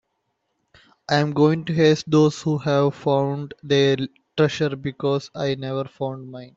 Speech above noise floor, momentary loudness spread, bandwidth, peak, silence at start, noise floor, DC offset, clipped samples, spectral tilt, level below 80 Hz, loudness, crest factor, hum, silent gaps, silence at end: 53 dB; 11 LU; 7.8 kHz; -4 dBFS; 1.1 s; -74 dBFS; under 0.1%; under 0.1%; -6.5 dB/octave; -60 dBFS; -21 LUFS; 18 dB; none; none; 0.1 s